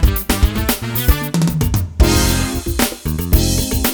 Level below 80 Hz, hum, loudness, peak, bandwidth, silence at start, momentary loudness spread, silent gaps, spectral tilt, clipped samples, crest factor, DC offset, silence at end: -18 dBFS; none; -16 LUFS; 0 dBFS; over 20 kHz; 0 s; 4 LU; none; -4.5 dB/octave; under 0.1%; 16 dB; under 0.1%; 0 s